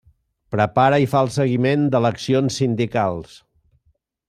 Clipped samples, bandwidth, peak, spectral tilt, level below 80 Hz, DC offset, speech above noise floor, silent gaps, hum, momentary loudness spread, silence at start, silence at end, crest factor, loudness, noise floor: under 0.1%; 14 kHz; -2 dBFS; -6.5 dB/octave; -56 dBFS; under 0.1%; 47 dB; none; none; 7 LU; 0.5 s; 1.05 s; 18 dB; -19 LUFS; -65 dBFS